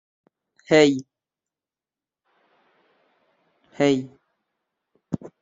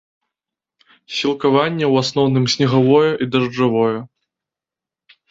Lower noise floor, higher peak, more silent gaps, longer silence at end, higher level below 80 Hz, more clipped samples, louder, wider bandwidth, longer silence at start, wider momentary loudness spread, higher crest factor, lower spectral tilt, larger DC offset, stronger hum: about the same, under -90 dBFS vs -88 dBFS; about the same, -4 dBFS vs -2 dBFS; neither; second, 0.15 s vs 1.25 s; second, -66 dBFS vs -58 dBFS; neither; second, -21 LUFS vs -16 LUFS; about the same, 7.8 kHz vs 7.8 kHz; second, 0.7 s vs 1.1 s; first, 17 LU vs 7 LU; first, 24 dB vs 16 dB; about the same, -5 dB/octave vs -6 dB/octave; neither; neither